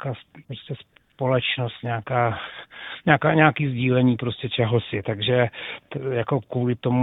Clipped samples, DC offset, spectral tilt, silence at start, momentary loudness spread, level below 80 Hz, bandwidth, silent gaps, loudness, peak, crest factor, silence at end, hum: under 0.1%; under 0.1%; -10 dB/octave; 0 s; 18 LU; -58 dBFS; 4.1 kHz; none; -23 LUFS; 0 dBFS; 22 dB; 0 s; none